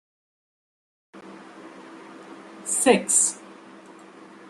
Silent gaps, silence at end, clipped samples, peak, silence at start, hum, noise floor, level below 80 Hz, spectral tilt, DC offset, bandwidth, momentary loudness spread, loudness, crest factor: none; 0.25 s; under 0.1%; -2 dBFS; 1.15 s; none; -46 dBFS; -76 dBFS; -2 dB/octave; under 0.1%; 13 kHz; 26 LU; -20 LUFS; 26 dB